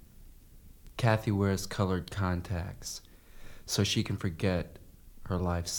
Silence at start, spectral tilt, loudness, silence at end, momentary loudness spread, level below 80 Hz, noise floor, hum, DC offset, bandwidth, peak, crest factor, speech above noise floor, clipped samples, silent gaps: 0.2 s; -5 dB/octave; -32 LUFS; 0 s; 15 LU; -50 dBFS; -53 dBFS; none; under 0.1%; 19 kHz; -10 dBFS; 22 dB; 22 dB; under 0.1%; none